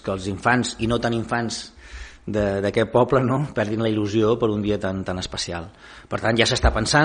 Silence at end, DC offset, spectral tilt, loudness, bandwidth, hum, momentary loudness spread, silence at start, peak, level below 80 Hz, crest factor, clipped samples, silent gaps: 0 s; under 0.1%; -5 dB/octave; -22 LUFS; 10 kHz; none; 13 LU; 0.05 s; -2 dBFS; -36 dBFS; 20 dB; under 0.1%; none